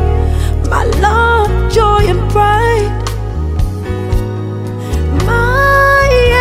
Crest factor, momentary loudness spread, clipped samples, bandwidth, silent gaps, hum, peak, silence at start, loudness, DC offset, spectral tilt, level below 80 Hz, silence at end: 10 dB; 11 LU; under 0.1%; 15.5 kHz; none; none; 0 dBFS; 0 s; -12 LUFS; under 0.1%; -6 dB/octave; -16 dBFS; 0 s